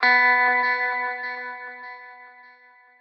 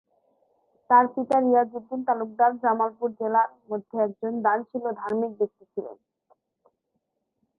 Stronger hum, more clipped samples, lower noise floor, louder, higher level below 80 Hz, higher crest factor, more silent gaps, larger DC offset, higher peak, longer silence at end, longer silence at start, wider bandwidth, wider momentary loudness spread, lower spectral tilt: neither; neither; second, -53 dBFS vs -78 dBFS; first, -20 LUFS vs -25 LUFS; second, under -90 dBFS vs -78 dBFS; about the same, 18 dB vs 20 dB; neither; neither; about the same, -6 dBFS vs -6 dBFS; second, 0.7 s vs 1.65 s; second, 0 s vs 0.9 s; first, 6.6 kHz vs 5.4 kHz; first, 22 LU vs 12 LU; second, -1.5 dB/octave vs -8.5 dB/octave